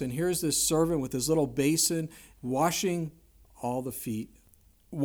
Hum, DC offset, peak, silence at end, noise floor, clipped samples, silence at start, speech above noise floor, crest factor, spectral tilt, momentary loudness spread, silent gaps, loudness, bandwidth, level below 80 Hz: none; under 0.1%; -14 dBFS; 0 s; -61 dBFS; under 0.1%; 0 s; 32 dB; 16 dB; -4 dB/octave; 15 LU; none; -28 LUFS; over 20 kHz; -56 dBFS